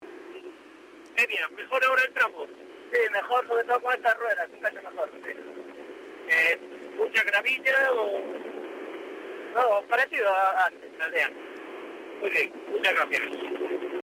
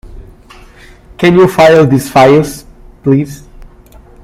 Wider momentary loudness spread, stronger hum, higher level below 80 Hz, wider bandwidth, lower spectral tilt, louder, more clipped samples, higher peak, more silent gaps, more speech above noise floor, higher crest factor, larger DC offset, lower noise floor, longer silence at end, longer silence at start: first, 18 LU vs 15 LU; neither; second, -78 dBFS vs -36 dBFS; about the same, 16 kHz vs 16 kHz; second, -1.5 dB/octave vs -6.5 dB/octave; second, -26 LUFS vs -8 LUFS; second, under 0.1% vs 0.7%; second, -12 dBFS vs 0 dBFS; neither; second, 23 dB vs 30 dB; first, 16 dB vs 10 dB; neither; first, -49 dBFS vs -37 dBFS; second, 0 s vs 0.6 s; about the same, 0 s vs 0.05 s